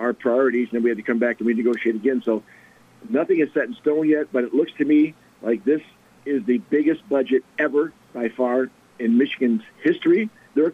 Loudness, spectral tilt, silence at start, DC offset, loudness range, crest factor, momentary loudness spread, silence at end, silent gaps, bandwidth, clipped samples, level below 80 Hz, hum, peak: -22 LUFS; -7.5 dB/octave; 0 s; under 0.1%; 1 LU; 12 dB; 7 LU; 0 s; none; 6.4 kHz; under 0.1%; -72 dBFS; none; -10 dBFS